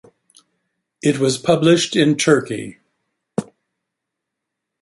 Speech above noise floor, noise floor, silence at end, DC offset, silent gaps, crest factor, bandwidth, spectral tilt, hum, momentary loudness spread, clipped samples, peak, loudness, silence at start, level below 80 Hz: 65 dB; -80 dBFS; 1.4 s; under 0.1%; none; 18 dB; 11.5 kHz; -4.5 dB/octave; none; 14 LU; under 0.1%; -2 dBFS; -17 LUFS; 1.05 s; -60 dBFS